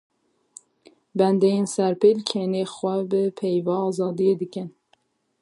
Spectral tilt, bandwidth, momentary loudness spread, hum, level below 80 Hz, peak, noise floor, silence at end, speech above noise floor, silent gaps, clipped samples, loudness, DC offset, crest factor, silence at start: -6.5 dB/octave; 11.5 kHz; 9 LU; none; -74 dBFS; -6 dBFS; -66 dBFS; 0.7 s; 44 dB; none; under 0.1%; -23 LUFS; under 0.1%; 18 dB; 1.15 s